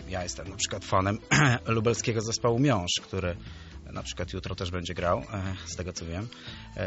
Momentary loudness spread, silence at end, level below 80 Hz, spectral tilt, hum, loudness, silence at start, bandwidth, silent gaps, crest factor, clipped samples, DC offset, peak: 15 LU; 0 s; -48 dBFS; -4.5 dB/octave; none; -29 LUFS; 0 s; 8 kHz; none; 20 dB; under 0.1%; under 0.1%; -8 dBFS